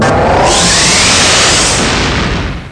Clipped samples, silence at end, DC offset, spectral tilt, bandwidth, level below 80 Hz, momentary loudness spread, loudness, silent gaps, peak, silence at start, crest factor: under 0.1%; 0 s; under 0.1%; -2.5 dB/octave; 11 kHz; -22 dBFS; 8 LU; -7 LUFS; none; -2 dBFS; 0 s; 6 dB